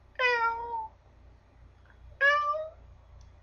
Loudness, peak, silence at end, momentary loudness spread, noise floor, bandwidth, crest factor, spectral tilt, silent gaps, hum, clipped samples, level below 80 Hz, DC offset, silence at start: -28 LUFS; -14 dBFS; 0.15 s; 16 LU; -56 dBFS; 7 kHz; 18 dB; -2.5 dB/octave; none; none; under 0.1%; -56 dBFS; under 0.1%; 0.2 s